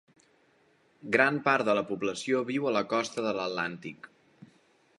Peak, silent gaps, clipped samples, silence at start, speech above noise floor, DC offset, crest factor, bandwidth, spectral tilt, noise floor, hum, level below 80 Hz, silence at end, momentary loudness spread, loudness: -8 dBFS; none; under 0.1%; 1.05 s; 37 dB; under 0.1%; 24 dB; 11.5 kHz; -4.5 dB/octave; -66 dBFS; none; -74 dBFS; 0.55 s; 16 LU; -28 LUFS